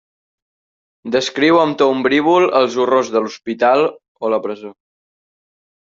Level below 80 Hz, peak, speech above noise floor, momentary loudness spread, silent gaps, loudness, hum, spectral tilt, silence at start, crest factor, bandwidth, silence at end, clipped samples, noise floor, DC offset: -62 dBFS; -2 dBFS; over 75 dB; 11 LU; 4.08-4.15 s; -15 LUFS; none; -4.5 dB/octave; 1.05 s; 16 dB; 7.8 kHz; 1.1 s; under 0.1%; under -90 dBFS; under 0.1%